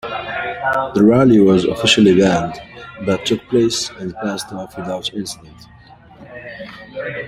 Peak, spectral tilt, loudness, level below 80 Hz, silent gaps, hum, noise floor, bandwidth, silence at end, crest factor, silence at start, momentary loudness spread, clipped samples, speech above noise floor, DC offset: 0 dBFS; -5 dB/octave; -16 LUFS; -48 dBFS; none; none; -42 dBFS; 15 kHz; 0 s; 16 dB; 0.05 s; 22 LU; under 0.1%; 26 dB; under 0.1%